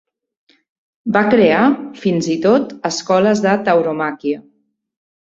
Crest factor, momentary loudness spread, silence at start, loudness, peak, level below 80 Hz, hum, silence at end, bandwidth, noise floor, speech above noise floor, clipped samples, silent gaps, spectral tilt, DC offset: 16 dB; 10 LU; 1.05 s; -15 LUFS; -2 dBFS; -58 dBFS; none; 0.8 s; 8 kHz; -62 dBFS; 48 dB; under 0.1%; none; -5.5 dB/octave; under 0.1%